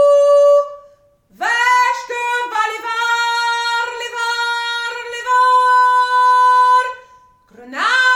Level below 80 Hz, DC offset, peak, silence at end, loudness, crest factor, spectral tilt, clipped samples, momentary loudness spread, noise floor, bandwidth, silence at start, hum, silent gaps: -64 dBFS; under 0.1%; -2 dBFS; 0 s; -14 LUFS; 12 dB; 0.5 dB/octave; under 0.1%; 11 LU; -51 dBFS; 16 kHz; 0 s; none; none